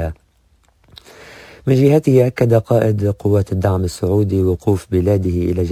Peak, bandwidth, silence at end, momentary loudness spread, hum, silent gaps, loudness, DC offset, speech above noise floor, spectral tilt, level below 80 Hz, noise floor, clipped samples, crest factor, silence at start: 0 dBFS; 16 kHz; 0 s; 6 LU; none; none; -16 LUFS; under 0.1%; 41 dB; -8.5 dB/octave; -32 dBFS; -56 dBFS; under 0.1%; 16 dB; 0 s